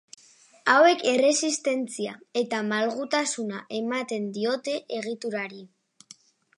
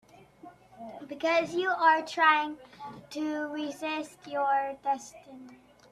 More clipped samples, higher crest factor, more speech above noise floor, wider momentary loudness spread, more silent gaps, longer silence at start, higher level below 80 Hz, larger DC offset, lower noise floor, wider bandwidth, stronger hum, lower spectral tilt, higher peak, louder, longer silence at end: neither; about the same, 22 dB vs 22 dB; first, 29 dB vs 24 dB; second, 13 LU vs 23 LU; neither; first, 0.65 s vs 0.45 s; second, -82 dBFS vs -74 dBFS; neither; about the same, -54 dBFS vs -53 dBFS; second, 11.5 kHz vs 14 kHz; neither; about the same, -2.5 dB/octave vs -3 dB/octave; first, -4 dBFS vs -8 dBFS; first, -25 LUFS vs -28 LUFS; first, 0.9 s vs 0.4 s